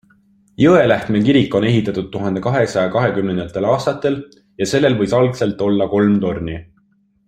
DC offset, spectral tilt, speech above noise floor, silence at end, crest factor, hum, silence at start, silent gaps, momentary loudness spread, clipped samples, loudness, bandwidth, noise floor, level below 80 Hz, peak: under 0.1%; -6.5 dB/octave; 43 dB; 0.65 s; 16 dB; none; 0.6 s; none; 9 LU; under 0.1%; -16 LUFS; 11 kHz; -58 dBFS; -48 dBFS; -2 dBFS